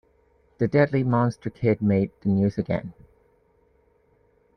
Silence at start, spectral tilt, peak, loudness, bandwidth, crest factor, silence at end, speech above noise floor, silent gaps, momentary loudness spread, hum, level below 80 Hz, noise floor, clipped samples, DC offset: 0.6 s; -9.5 dB/octave; -6 dBFS; -24 LUFS; 9.6 kHz; 20 dB; 1.65 s; 40 dB; none; 8 LU; none; -56 dBFS; -63 dBFS; under 0.1%; under 0.1%